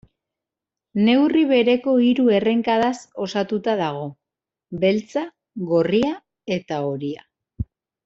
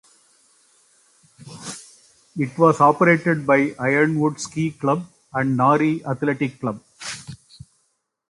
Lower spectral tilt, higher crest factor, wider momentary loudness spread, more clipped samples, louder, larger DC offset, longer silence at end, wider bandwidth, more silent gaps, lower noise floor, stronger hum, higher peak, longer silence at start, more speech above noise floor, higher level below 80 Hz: about the same, -6.5 dB/octave vs -6.5 dB/octave; about the same, 16 dB vs 20 dB; about the same, 17 LU vs 19 LU; neither; about the same, -20 LUFS vs -20 LUFS; neither; second, 0.4 s vs 0.95 s; second, 7.8 kHz vs 11.5 kHz; neither; first, -87 dBFS vs -70 dBFS; neither; about the same, -4 dBFS vs -2 dBFS; second, 0.95 s vs 1.45 s; first, 68 dB vs 51 dB; first, -52 dBFS vs -62 dBFS